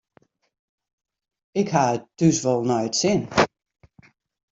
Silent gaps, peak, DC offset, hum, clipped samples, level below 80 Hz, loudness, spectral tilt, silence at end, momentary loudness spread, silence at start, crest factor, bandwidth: none; -4 dBFS; under 0.1%; none; under 0.1%; -58 dBFS; -22 LUFS; -4.5 dB/octave; 1.05 s; 4 LU; 1.55 s; 20 dB; 8 kHz